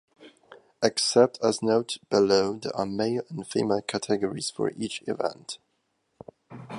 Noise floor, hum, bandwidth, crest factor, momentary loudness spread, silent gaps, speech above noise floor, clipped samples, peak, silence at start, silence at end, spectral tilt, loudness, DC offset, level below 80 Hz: -74 dBFS; none; 11.5 kHz; 24 dB; 12 LU; none; 49 dB; under 0.1%; -4 dBFS; 0.2 s; 0 s; -4 dB/octave; -26 LUFS; under 0.1%; -66 dBFS